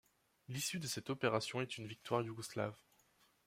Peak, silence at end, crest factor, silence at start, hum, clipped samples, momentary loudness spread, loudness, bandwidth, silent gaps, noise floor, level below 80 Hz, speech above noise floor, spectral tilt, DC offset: -20 dBFS; 0.7 s; 22 dB; 0.5 s; none; under 0.1%; 8 LU; -41 LUFS; 16 kHz; none; -74 dBFS; -78 dBFS; 33 dB; -4 dB/octave; under 0.1%